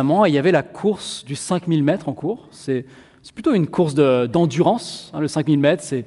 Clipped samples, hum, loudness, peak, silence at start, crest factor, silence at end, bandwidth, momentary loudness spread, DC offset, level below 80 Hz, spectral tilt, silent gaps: under 0.1%; none; -19 LUFS; -2 dBFS; 0 s; 16 dB; 0 s; 11.5 kHz; 11 LU; under 0.1%; -58 dBFS; -6.5 dB/octave; none